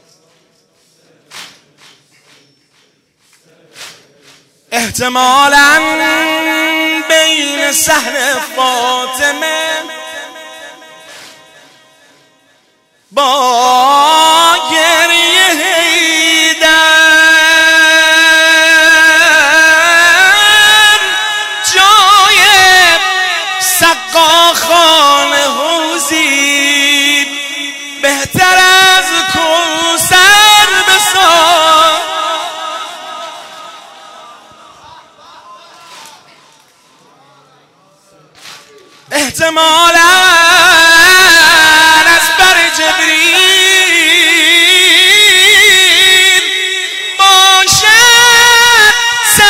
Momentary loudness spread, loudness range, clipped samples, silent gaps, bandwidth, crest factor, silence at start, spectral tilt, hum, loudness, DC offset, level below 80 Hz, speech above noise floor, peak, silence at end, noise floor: 11 LU; 12 LU; 0.5%; none; over 20 kHz; 8 dB; 1.35 s; 0 dB/octave; none; -5 LUFS; under 0.1%; -44 dBFS; 43 dB; 0 dBFS; 0 s; -53 dBFS